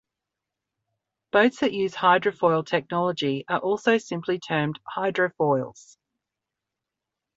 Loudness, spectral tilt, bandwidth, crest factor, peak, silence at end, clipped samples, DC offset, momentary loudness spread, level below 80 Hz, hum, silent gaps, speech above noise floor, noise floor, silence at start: -24 LUFS; -5.5 dB/octave; 8 kHz; 20 dB; -6 dBFS; 1.65 s; under 0.1%; under 0.1%; 8 LU; -68 dBFS; none; none; 62 dB; -86 dBFS; 1.35 s